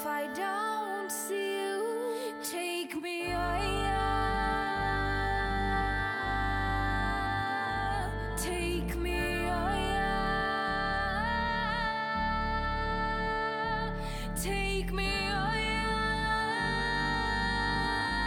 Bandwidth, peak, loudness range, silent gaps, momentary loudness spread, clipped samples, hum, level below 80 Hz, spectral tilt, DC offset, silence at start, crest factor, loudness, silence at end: 18.5 kHz; -18 dBFS; 2 LU; none; 4 LU; under 0.1%; none; -40 dBFS; -4.5 dB/octave; under 0.1%; 0 s; 14 dB; -31 LUFS; 0 s